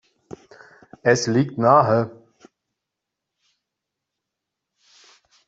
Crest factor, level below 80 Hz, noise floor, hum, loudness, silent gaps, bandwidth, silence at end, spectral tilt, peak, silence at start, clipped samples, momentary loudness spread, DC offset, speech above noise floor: 22 dB; -64 dBFS; -83 dBFS; none; -19 LUFS; none; 8 kHz; 3.35 s; -5.5 dB/octave; -2 dBFS; 1.05 s; under 0.1%; 13 LU; under 0.1%; 66 dB